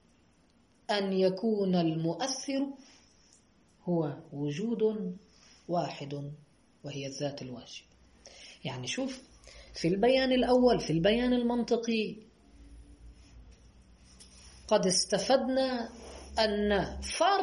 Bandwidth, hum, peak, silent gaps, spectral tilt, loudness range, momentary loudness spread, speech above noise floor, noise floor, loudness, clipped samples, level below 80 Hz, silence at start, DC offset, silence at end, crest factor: 11.5 kHz; none; -12 dBFS; none; -4.5 dB/octave; 11 LU; 19 LU; 36 dB; -66 dBFS; -30 LUFS; under 0.1%; -54 dBFS; 0.9 s; under 0.1%; 0 s; 20 dB